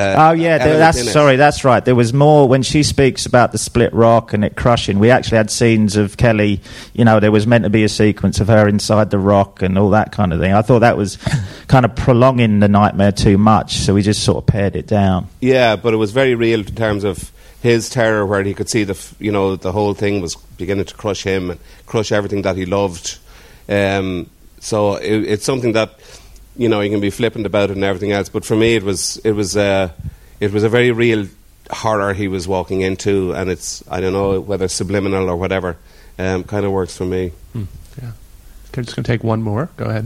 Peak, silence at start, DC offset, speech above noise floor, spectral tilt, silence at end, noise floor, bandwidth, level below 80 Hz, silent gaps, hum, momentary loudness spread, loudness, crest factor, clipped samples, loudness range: 0 dBFS; 0 s; under 0.1%; 24 dB; -5.5 dB/octave; 0 s; -39 dBFS; 14.5 kHz; -36 dBFS; none; none; 12 LU; -15 LUFS; 14 dB; under 0.1%; 7 LU